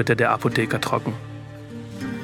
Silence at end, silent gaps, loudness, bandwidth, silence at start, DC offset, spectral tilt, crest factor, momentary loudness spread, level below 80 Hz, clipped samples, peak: 0 s; none; -23 LUFS; 17 kHz; 0 s; under 0.1%; -6 dB/octave; 20 dB; 18 LU; -54 dBFS; under 0.1%; -4 dBFS